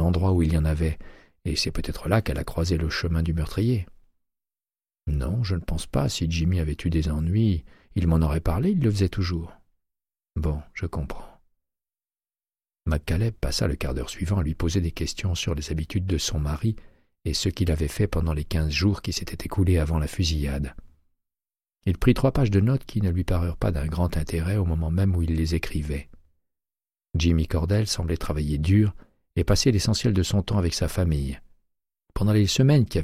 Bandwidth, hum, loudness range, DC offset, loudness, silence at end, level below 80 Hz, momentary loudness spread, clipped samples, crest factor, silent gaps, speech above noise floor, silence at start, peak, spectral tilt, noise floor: 15 kHz; none; 5 LU; under 0.1%; -25 LUFS; 0 s; -32 dBFS; 10 LU; under 0.1%; 18 dB; none; over 66 dB; 0 s; -6 dBFS; -6 dB/octave; under -90 dBFS